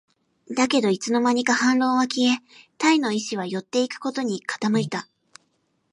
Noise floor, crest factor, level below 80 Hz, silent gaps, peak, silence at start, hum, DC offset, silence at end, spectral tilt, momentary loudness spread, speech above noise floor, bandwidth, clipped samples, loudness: -70 dBFS; 16 dB; -72 dBFS; none; -6 dBFS; 0.5 s; none; under 0.1%; 0.9 s; -4 dB/octave; 8 LU; 47 dB; 11.5 kHz; under 0.1%; -23 LUFS